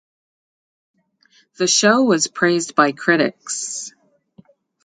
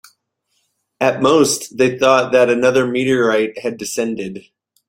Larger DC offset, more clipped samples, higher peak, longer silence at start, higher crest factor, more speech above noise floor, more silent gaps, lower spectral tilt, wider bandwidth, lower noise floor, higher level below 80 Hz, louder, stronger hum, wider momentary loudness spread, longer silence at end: neither; neither; about the same, 0 dBFS vs 0 dBFS; first, 1.6 s vs 1 s; about the same, 20 dB vs 16 dB; second, 40 dB vs 53 dB; neither; second, -2.5 dB/octave vs -4 dB/octave; second, 9.6 kHz vs 16.5 kHz; second, -58 dBFS vs -68 dBFS; second, -70 dBFS vs -58 dBFS; about the same, -17 LUFS vs -16 LUFS; neither; about the same, 12 LU vs 11 LU; first, 0.95 s vs 0.5 s